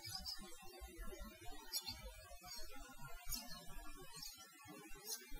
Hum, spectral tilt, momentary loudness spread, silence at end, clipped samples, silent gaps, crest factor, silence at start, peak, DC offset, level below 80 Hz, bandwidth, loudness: none; -1.5 dB/octave; 11 LU; 0 s; under 0.1%; none; 20 dB; 0 s; -30 dBFS; under 0.1%; -58 dBFS; 16 kHz; -51 LUFS